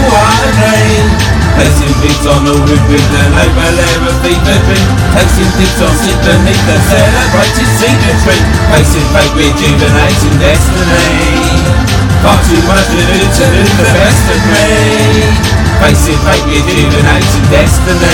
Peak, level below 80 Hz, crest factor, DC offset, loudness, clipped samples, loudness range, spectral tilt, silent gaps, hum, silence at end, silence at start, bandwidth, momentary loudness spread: 0 dBFS; -14 dBFS; 6 dB; under 0.1%; -7 LUFS; 4%; 1 LU; -5 dB/octave; none; none; 0 s; 0 s; 18 kHz; 2 LU